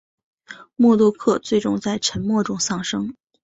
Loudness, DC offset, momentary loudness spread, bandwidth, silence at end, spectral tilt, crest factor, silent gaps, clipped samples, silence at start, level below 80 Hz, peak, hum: -20 LUFS; under 0.1%; 11 LU; 8 kHz; 0.3 s; -4.5 dB/octave; 16 dB; none; under 0.1%; 0.5 s; -54 dBFS; -6 dBFS; none